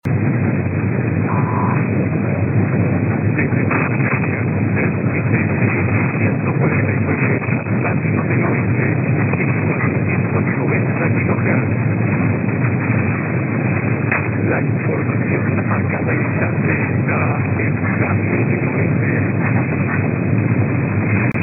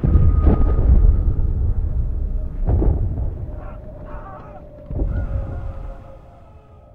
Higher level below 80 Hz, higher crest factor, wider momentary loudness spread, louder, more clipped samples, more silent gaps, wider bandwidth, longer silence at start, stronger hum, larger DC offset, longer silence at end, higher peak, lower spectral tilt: second, -52 dBFS vs -20 dBFS; about the same, 14 dB vs 16 dB; second, 2 LU vs 20 LU; first, -17 LUFS vs -21 LUFS; neither; neither; about the same, 2.8 kHz vs 2.8 kHz; about the same, 0.05 s vs 0 s; neither; neither; second, 0 s vs 0.75 s; about the same, -2 dBFS vs -2 dBFS; about the same, -11.5 dB/octave vs -12 dB/octave